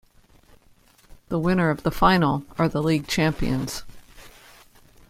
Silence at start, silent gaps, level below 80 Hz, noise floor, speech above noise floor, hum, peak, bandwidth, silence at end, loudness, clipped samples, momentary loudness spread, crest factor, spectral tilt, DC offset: 1.3 s; none; -42 dBFS; -56 dBFS; 34 dB; none; -4 dBFS; 16 kHz; 0.8 s; -23 LUFS; under 0.1%; 10 LU; 20 dB; -6 dB/octave; under 0.1%